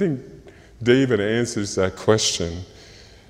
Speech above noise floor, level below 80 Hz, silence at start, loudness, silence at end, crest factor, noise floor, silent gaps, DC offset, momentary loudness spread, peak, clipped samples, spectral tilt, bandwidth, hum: 25 dB; -48 dBFS; 0 s; -21 LUFS; 0.25 s; 20 dB; -46 dBFS; none; under 0.1%; 13 LU; -2 dBFS; under 0.1%; -4.5 dB/octave; 15.5 kHz; none